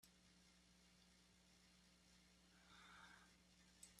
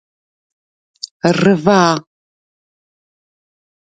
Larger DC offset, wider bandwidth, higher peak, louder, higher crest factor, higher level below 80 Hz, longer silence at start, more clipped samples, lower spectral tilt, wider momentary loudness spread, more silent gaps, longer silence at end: neither; first, 13 kHz vs 9.2 kHz; second, -48 dBFS vs 0 dBFS; second, -66 LUFS vs -14 LUFS; about the same, 22 dB vs 18 dB; second, -82 dBFS vs -58 dBFS; second, 0 s vs 1.25 s; neither; second, -2 dB/octave vs -5.5 dB/octave; second, 4 LU vs 18 LU; neither; second, 0 s vs 1.9 s